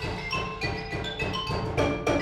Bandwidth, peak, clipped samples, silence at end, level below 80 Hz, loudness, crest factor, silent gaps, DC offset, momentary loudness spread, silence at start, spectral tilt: 14.5 kHz; -12 dBFS; under 0.1%; 0 s; -42 dBFS; -29 LUFS; 16 dB; none; under 0.1%; 5 LU; 0 s; -5.5 dB/octave